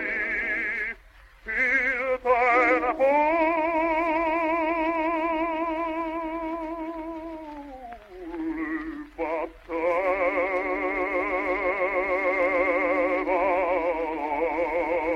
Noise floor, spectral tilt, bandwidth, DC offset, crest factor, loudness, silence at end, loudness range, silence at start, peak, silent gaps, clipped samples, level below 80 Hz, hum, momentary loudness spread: -51 dBFS; -5.5 dB/octave; 7.6 kHz; under 0.1%; 16 dB; -25 LUFS; 0 s; 10 LU; 0 s; -10 dBFS; none; under 0.1%; -52 dBFS; none; 13 LU